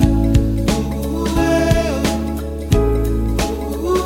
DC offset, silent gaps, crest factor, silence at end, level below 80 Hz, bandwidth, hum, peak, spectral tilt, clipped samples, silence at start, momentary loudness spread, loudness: under 0.1%; none; 16 dB; 0 s; -22 dBFS; 16.5 kHz; none; -2 dBFS; -6.5 dB/octave; under 0.1%; 0 s; 7 LU; -18 LUFS